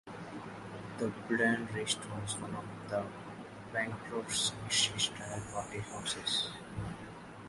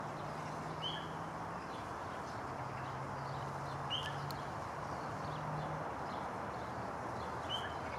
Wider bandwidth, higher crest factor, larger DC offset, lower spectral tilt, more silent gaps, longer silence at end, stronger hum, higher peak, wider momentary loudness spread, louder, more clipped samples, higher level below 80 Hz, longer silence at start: second, 11.5 kHz vs 15.5 kHz; first, 22 dB vs 16 dB; neither; second, -2.5 dB/octave vs -5 dB/octave; neither; about the same, 0 s vs 0 s; neither; first, -16 dBFS vs -26 dBFS; first, 15 LU vs 4 LU; first, -35 LUFS vs -42 LUFS; neither; about the same, -62 dBFS vs -64 dBFS; about the same, 0.05 s vs 0 s